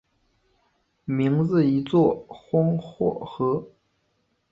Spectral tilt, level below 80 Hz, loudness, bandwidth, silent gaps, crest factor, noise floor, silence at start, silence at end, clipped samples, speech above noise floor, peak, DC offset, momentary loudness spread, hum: -10 dB/octave; -60 dBFS; -24 LUFS; 7.2 kHz; none; 16 dB; -71 dBFS; 1.1 s; 0.85 s; under 0.1%; 48 dB; -8 dBFS; under 0.1%; 9 LU; none